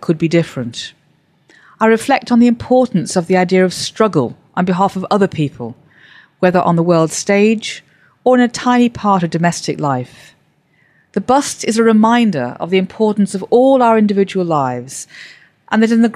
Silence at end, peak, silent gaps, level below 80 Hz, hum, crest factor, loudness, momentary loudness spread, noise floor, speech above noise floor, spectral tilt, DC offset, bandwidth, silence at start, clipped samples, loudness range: 0 s; -2 dBFS; none; -56 dBFS; none; 14 dB; -14 LUFS; 12 LU; -56 dBFS; 43 dB; -5.5 dB/octave; under 0.1%; 13.5 kHz; 0 s; under 0.1%; 3 LU